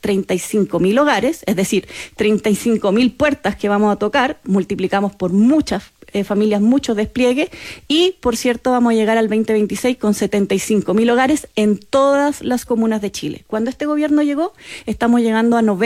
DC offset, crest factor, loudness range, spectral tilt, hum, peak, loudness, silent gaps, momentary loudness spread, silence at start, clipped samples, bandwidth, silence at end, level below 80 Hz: under 0.1%; 12 dB; 1 LU; -5 dB/octave; none; -4 dBFS; -17 LUFS; none; 7 LU; 0.05 s; under 0.1%; 15.5 kHz; 0 s; -46 dBFS